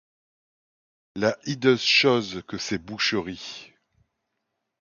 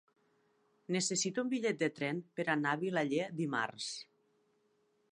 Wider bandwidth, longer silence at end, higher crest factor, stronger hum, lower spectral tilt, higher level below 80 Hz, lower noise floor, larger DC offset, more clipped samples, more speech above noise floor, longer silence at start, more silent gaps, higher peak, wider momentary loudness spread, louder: second, 7.4 kHz vs 11 kHz; about the same, 1.15 s vs 1.1 s; about the same, 20 dB vs 20 dB; neither; about the same, -4 dB/octave vs -4 dB/octave; first, -62 dBFS vs -86 dBFS; first, -80 dBFS vs -75 dBFS; neither; neither; first, 56 dB vs 40 dB; first, 1.15 s vs 0.9 s; neither; first, -6 dBFS vs -18 dBFS; first, 19 LU vs 6 LU; first, -23 LUFS vs -35 LUFS